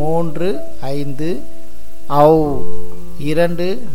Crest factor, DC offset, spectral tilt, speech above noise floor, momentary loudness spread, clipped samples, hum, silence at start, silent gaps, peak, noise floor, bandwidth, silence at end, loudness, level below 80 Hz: 16 dB; 20%; -7.5 dB/octave; 23 dB; 16 LU; under 0.1%; none; 0 s; none; 0 dBFS; -37 dBFS; 17 kHz; 0 s; -18 LUFS; -38 dBFS